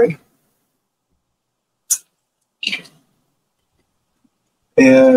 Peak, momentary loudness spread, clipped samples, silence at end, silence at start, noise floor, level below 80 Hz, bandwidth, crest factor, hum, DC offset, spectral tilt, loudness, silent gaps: 0 dBFS; 16 LU; under 0.1%; 0 s; 0 s; -74 dBFS; -62 dBFS; 15.5 kHz; 18 dB; none; under 0.1%; -4 dB/octave; -16 LUFS; none